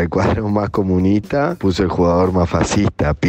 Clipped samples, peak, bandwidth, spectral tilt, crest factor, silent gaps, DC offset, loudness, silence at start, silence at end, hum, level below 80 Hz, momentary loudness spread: under 0.1%; -6 dBFS; 9 kHz; -6.5 dB/octave; 10 dB; none; under 0.1%; -17 LUFS; 0 s; 0 s; none; -32 dBFS; 3 LU